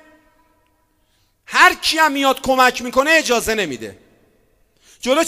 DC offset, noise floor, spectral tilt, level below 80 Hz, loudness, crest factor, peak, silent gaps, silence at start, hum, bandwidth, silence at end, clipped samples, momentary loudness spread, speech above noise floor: under 0.1%; -62 dBFS; -1.5 dB/octave; -48 dBFS; -15 LUFS; 18 dB; 0 dBFS; none; 1.5 s; none; 16 kHz; 0 s; under 0.1%; 13 LU; 45 dB